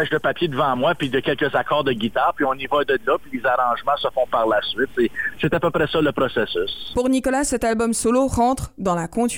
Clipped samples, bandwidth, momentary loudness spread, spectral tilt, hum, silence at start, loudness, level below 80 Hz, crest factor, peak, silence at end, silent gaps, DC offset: under 0.1%; 17 kHz; 4 LU; -4.5 dB/octave; none; 0 s; -21 LUFS; -44 dBFS; 12 dB; -8 dBFS; 0 s; none; 1%